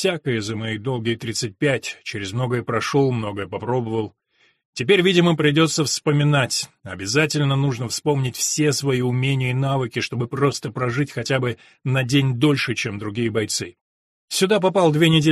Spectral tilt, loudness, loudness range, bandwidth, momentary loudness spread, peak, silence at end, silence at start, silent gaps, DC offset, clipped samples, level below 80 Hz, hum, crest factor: -5 dB/octave; -21 LUFS; 4 LU; 14 kHz; 9 LU; -4 dBFS; 0 s; 0 s; 4.65-4.73 s, 13.81-14.28 s; under 0.1%; under 0.1%; -56 dBFS; none; 16 dB